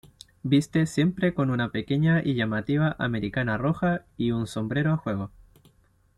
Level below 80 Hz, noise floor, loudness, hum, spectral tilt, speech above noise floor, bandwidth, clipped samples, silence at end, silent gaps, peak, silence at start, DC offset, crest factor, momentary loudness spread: -52 dBFS; -62 dBFS; -26 LUFS; none; -7 dB/octave; 37 dB; 12 kHz; under 0.1%; 0.9 s; none; -10 dBFS; 0.45 s; under 0.1%; 16 dB; 6 LU